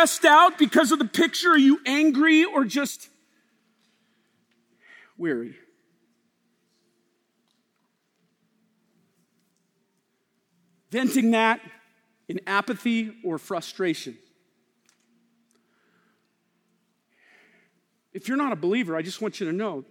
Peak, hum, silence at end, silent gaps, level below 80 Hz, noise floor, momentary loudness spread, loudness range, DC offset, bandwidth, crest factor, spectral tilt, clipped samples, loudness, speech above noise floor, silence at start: -4 dBFS; none; 0.1 s; none; -80 dBFS; -73 dBFS; 15 LU; 17 LU; under 0.1%; 19 kHz; 22 dB; -3.5 dB/octave; under 0.1%; -22 LUFS; 51 dB; 0 s